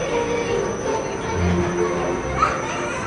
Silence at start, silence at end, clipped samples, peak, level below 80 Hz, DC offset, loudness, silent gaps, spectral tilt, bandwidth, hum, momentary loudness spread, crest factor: 0 s; 0 s; under 0.1%; -6 dBFS; -40 dBFS; under 0.1%; -22 LUFS; none; -5 dB/octave; 11 kHz; none; 4 LU; 16 dB